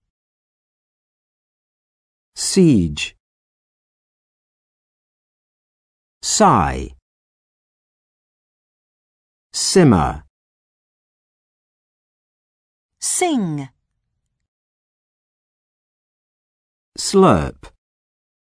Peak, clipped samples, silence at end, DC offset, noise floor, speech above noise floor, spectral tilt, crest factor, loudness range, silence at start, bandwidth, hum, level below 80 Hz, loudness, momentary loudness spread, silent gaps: -2 dBFS; under 0.1%; 0.9 s; under 0.1%; -74 dBFS; 59 dB; -4.5 dB/octave; 20 dB; 7 LU; 2.35 s; 11 kHz; none; -42 dBFS; -16 LUFS; 17 LU; 3.20-6.21 s, 7.02-9.50 s, 10.30-12.89 s, 14.48-16.92 s